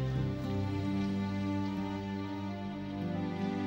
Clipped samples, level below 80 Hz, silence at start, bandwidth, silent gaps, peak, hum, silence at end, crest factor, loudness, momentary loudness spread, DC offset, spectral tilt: under 0.1%; -54 dBFS; 0 s; 16 kHz; none; -22 dBFS; none; 0 s; 12 dB; -36 LUFS; 5 LU; under 0.1%; -8 dB/octave